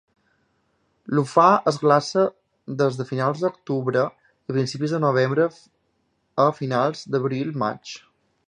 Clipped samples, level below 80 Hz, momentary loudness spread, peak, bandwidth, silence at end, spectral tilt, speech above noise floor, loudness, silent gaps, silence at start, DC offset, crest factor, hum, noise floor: under 0.1%; -70 dBFS; 12 LU; -2 dBFS; 10.5 kHz; 0.5 s; -6.5 dB/octave; 48 dB; -22 LUFS; none; 1.1 s; under 0.1%; 20 dB; none; -70 dBFS